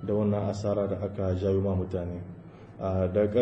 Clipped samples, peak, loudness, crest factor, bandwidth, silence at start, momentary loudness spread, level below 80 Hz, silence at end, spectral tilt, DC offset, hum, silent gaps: under 0.1%; -12 dBFS; -29 LUFS; 16 dB; 8 kHz; 0 s; 14 LU; -54 dBFS; 0 s; -9 dB/octave; under 0.1%; none; none